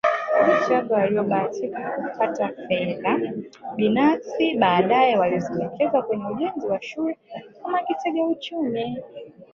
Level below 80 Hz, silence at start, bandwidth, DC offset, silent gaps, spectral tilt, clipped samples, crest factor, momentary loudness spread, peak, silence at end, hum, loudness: -64 dBFS; 0.05 s; 7.2 kHz; under 0.1%; none; -6.5 dB/octave; under 0.1%; 20 dB; 12 LU; -4 dBFS; 0.1 s; none; -23 LUFS